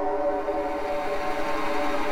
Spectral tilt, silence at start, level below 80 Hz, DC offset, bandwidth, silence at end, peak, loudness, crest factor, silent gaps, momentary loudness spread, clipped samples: -4.5 dB/octave; 0 s; -42 dBFS; under 0.1%; 17.5 kHz; 0 s; -14 dBFS; -28 LUFS; 12 dB; none; 2 LU; under 0.1%